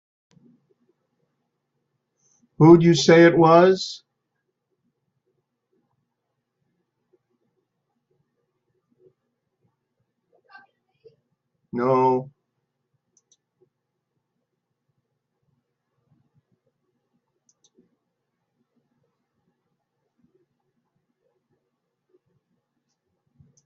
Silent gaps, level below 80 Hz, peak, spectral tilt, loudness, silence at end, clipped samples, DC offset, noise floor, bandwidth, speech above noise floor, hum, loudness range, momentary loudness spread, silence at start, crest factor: none; -64 dBFS; -2 dBFS; -5.5 dB/octave; -16 LUFS; 11.4 s; under 0.1%; under 0.1%; -79 dBFS; 7.6 kHz; 64 dB; none; 11 LU; 17 LU; 2.6 s; 24 dB